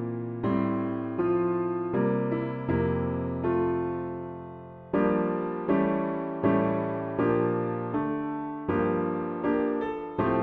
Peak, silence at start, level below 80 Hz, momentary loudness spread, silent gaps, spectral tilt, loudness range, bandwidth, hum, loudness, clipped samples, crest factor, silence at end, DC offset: -12 dBFS; 0 s; -54 dBFS; 7 LU; none; -11 dB/octave; 2 LU; 4.3 kHz; none; -28 LUFS; under 0.1%; 16 dB; 0 s; under 0.1%